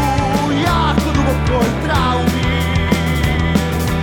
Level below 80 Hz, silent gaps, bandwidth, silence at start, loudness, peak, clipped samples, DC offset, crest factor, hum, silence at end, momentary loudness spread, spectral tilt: -24 dBFS; none; 19.5 kHz; 0 s; -16 LUFS; 0 dBFS; under 0.1%; under 0.1%; 14 dB; none; 0 s; 2 LU; -6 dB/octave